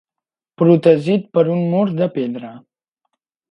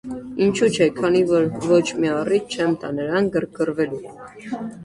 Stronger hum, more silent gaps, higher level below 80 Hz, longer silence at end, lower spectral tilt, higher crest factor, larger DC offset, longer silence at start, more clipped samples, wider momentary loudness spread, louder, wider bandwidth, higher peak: neither; neither; second, -64 dBFS vs -56 dBFS; first, 0.9 s vs 0 s; first, -9.5 dB/octave vs -5.5 dB/octave; about the same, 18 dB vs 16 dB; neither; first, 0.6 s vs 0.05 s; neither; about the same, 12 LU vs 13 LU; first, -16 LUFS vs -20 LUFS; second, 8.2 kHz vs 11.5 kHz; first, 0 dBFS vs -4 dBFS